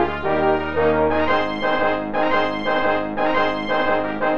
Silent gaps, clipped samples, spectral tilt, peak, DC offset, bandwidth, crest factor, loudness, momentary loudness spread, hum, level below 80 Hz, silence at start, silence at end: none; under 0.1%; -6.5 dB/octave; -6 dBFS; 3%; 6.6 kHz; 14 dB; -20 LUFS; 3 LU; none; -42 dBFS; 0 s; 0 s